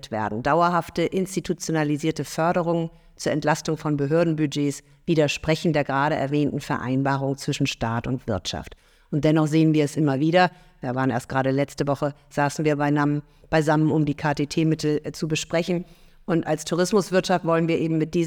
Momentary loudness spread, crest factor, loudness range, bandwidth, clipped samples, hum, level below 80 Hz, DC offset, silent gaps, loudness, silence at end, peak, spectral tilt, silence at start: 7 LU; 18 dB; 2 LU; 19 kHz; under 0.1%; none; -50 dBFS; under 0.1%; none; -23 LUFS; 0 s; -6 dBFS; -6 dB/octave; 0.05 s